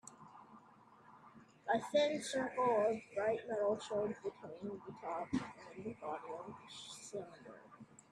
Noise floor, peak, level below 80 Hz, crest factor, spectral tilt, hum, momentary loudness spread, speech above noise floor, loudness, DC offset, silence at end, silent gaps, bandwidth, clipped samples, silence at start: -64 dBFS; -22 dBFS; -78 dBFS; 18 dB; -4.5 dB/octave; none; 23 LU; 24 dB; -40 LUFS; under 0.1%; 0.25 s; none; 12.5 kHz; under 0.1%; 0.05 s